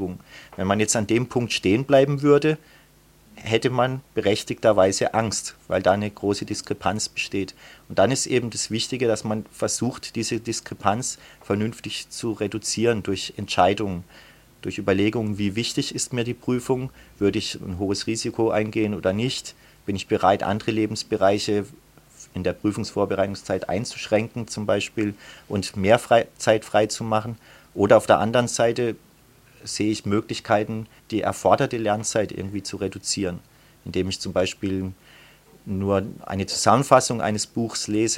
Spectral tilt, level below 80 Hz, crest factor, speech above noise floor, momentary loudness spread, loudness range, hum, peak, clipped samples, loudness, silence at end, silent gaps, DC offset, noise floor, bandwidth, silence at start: -4.5 dB/octave; -54 dBFS; 22 dB; 31 dB; 12 LU; 4 LU; none; 0 dBFS; under 0.1%; -23 LUFS; 0 s; none; under 0.1%; -54 dBFS; 16 kHz; 0 s